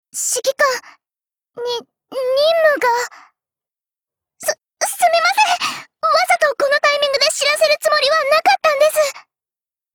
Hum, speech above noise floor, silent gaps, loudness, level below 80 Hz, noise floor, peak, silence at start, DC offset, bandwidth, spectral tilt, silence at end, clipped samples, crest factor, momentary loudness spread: none; over 74 dB; none; -16 LUFS; -64 dBFS; under -90 dBFS; -4 dBFS; 0.15 s; under 0.1%; over 20 kHz; 1 dB/octave; 0.75 s; under 0.1%; 14 dB; 11 LU